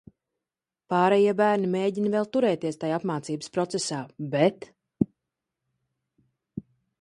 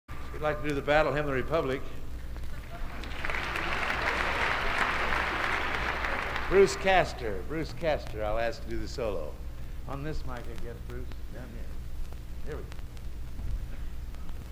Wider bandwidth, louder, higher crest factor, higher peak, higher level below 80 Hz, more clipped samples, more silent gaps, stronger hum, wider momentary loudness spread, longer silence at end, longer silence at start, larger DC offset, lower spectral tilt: second, 11.5 kHz vs 16 kHz; first, -26 LUFS vs -30 LUFS; about the same, 20 dB vs 22 dB; about the same, -6 dBFS vs -8 dBFS; second, -66 dBFS vs -38 dBFS; neither; neither; neither; about the same, 15 LU vs 17 LU; first, 0.4 s vs 0 s; first, 0.9 s vs 0.1 s; neither; about the same, -5.5 dB/octave vs -5 dB/octave